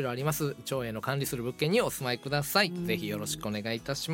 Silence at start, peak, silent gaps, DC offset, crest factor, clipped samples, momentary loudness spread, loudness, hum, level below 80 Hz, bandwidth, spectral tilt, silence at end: 0 s; -10 dBFS; none; under 0.1%; 22 dB; under 0.1%; 7 LU; -31 LUFS; none; -58 dBFS; 17 kHz; -4.5 dB/octave; 0 s